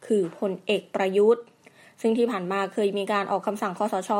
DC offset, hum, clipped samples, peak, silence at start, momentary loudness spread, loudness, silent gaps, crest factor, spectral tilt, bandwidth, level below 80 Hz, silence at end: under 0.1%; none; under 0.1%; -10 dBFS; 0 s; 7 LU; -25 LUFS; none; 16 dB; -5.5 dB/octave; 16 kHz; -80 dBFS; 0 s